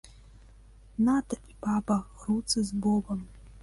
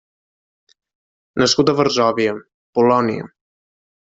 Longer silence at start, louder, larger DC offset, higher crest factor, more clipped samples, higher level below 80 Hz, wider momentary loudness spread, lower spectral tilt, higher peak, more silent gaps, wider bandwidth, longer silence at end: second, 1 s vs 1.35 s; second, -29 LUFS vs -17 LUFS; neither; about the same, 14 dB vs 18 dB; neither; first, -50 dBFS vs -58 dBFS; about the same, 12 LU vs 14 LU; about the same, -5 dB/octave vs -4.5 dB/octave; second, -16 dBFS vs -2 dBFS; second, none vs 2.54-2.73 s; first, 11.5 kHz vs 8 kHz; second, 0 s vs 0.9 s